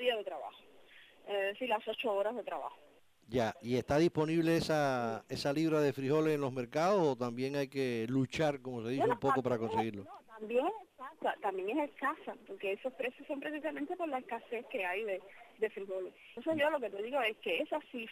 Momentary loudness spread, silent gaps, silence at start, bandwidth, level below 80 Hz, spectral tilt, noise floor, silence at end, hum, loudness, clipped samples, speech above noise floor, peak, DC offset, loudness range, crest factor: 11 LU; none; 0 s; 15.5 kHz; -68 dBFS; -6 dB/octave; -59 dBFS; 0 s; none; -35 LUFS; under 0.1%; 24 dB; -20 dBFS; under 0.1%; 7 LU; 16 dB